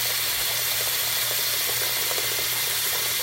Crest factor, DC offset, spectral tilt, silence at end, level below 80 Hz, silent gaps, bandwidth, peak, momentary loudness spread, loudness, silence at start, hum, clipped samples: 14 dB; under 0.1%; 0.5 dB/octave; 0 s; -56 dBFS; none; 16 kHz; -10 dBFS; 1 LU; -22 LUFS; 0 s; none; under 0.1%